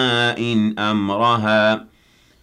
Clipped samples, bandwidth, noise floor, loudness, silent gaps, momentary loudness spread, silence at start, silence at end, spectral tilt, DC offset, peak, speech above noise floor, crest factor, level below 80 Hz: under 0.1%; 10 kHz; -55 dBFS; -18 LUFS; none; 4 LU; 0 s; 0.6 s; -5.5 dB/octave; under 0.1%; -4 dBFS; 37 dB; 14 dB; -58 dBFS